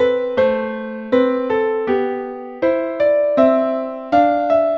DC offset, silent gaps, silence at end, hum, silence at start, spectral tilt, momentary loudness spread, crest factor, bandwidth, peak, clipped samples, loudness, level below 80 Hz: under 0.1%; none; 0 s; none; 0 s; -7 dB/octave; 9 LU; 16 dB; 6.2 kHz; -2 dBFS; under 0.1%; -17 LUFS; -54 dBFS